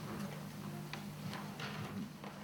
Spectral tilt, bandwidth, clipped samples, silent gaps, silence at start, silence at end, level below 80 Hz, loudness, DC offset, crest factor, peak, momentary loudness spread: -5.5 dB/octave; 19.5 kHz; under 0.1%; none; 0 s; 0 s; -70 dBFS; -45 LUFS; under 0.1%; 18 dB; -28 dBFS; 2 LU